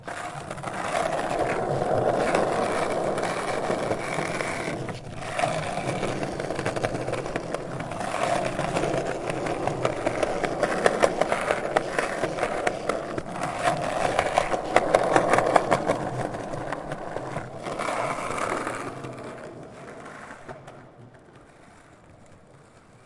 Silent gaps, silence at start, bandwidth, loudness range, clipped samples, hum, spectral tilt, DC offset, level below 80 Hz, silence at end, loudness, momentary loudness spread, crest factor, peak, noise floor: none; 0 s; 11.5 kHz; 9 LU; under 0.1%; none; -5 dB/octave; under 0.1%; -50 dBFS; 0.25 s; -27 LUFS; 13 LU; 26 dB; 0 dBFS; -52 dBFS